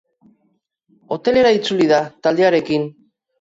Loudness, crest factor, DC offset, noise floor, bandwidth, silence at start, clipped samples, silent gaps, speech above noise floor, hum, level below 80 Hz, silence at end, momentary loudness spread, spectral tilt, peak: -16 LUFS; 16 dB; under 0.1%; -66 dBFS; 7.8 kHz; 1.1 s; under 0.1%; none; 50 dB; none; -56 dBFS; 0.5 s; 8 LU; -5.5 dB/octave; -4 dBFS